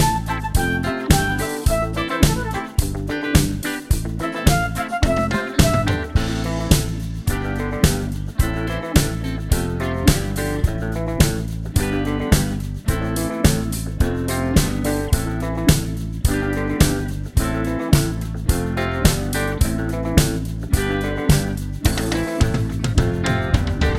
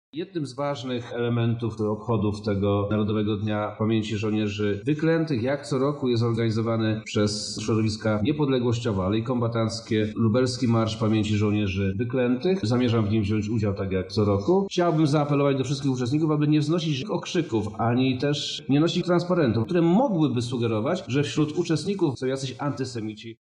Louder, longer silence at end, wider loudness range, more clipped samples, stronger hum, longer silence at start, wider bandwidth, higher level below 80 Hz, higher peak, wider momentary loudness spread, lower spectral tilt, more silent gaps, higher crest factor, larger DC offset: first, -21 LUFS vs -25 LUFS; about the same, 0 s vs 0.1 s; about the same, 1 LU vs 2 LU; neither; neither; second, 0 s vs 0.15 s; first, 16 kHz vs 10.5 kHz; first, -26 dBFS vs -56 dBFS; first, 0 dBFS vs -8 dBFS; about the same, 6 LU vs 6 LU; second, -5 dB/octave vs -6.5 dB/octave; neither; about the same, 20 dB vs 16 dB; neither